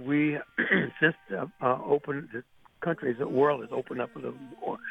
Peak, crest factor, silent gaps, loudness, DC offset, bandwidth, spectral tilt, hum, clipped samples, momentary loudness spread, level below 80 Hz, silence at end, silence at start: -8 dBFS; 22 dB; none; -29 LUFS; under 0.1%; 5.2 kHz; -8 dB/octave; none; under 0.1%; 12 LU; -70 dBFS; 0 s; 0 s